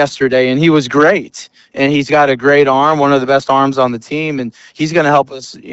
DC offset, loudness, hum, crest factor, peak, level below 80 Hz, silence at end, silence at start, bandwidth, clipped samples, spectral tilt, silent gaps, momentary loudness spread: under 0.1%; -12 LUFS; none; 12 dB; 0 dBFS; -52 dBFS; 0 s; 0 s; 8.2 kHz; under 0.1%; -5.5 dB/octave; none; 12 LU